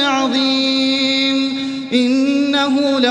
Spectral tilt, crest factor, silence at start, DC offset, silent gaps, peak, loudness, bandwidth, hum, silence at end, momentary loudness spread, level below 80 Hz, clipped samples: -3 dB/octave; 14 dB; 0 s; under 0.1%; none; 0 dBFS; -15 LUFS; 10 kHz; none; 0 s; 4 LU; -60 dBFS; under 0.1%